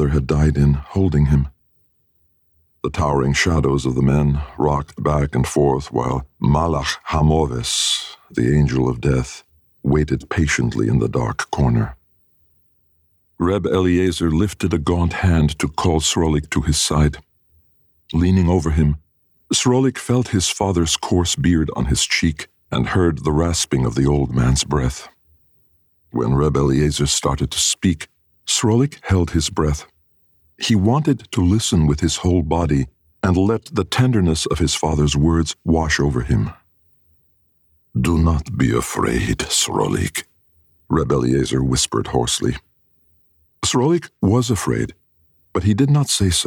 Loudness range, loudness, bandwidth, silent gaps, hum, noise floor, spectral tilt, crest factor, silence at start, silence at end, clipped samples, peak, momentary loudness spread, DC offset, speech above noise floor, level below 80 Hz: 3 LU; -18 LUFS; 19 kHz; none; none; -62 dBFS; -5 dB/octave; 14 dB; 0 s; 0 s; under 0.1%; -4 dBFS; 6 LU; under 0.1%; 45 dB; -30 dBFS